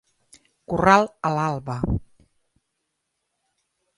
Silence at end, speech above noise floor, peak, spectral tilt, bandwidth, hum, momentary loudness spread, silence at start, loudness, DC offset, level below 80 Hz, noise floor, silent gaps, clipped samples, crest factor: 1.95 s; 57 dB; -2 dBFS; -6.5 dB/octave; 11.5 kHz; none; 12 LU; 0.7 s; -22 LUFS; under 0.1%; -42 dBFS; -78 dBFS; none; under 0.1%; 24 dB